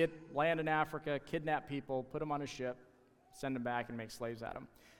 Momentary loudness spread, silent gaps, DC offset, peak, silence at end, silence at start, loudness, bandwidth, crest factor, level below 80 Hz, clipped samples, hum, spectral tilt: 11 LU; none; under 0.1%; -20 dBFS; 0.1 s; 0 s; -39 LUFS; 17.5 kHz; 20 dB; -66 dBFS; under 0.1%; none; -6 dB/octave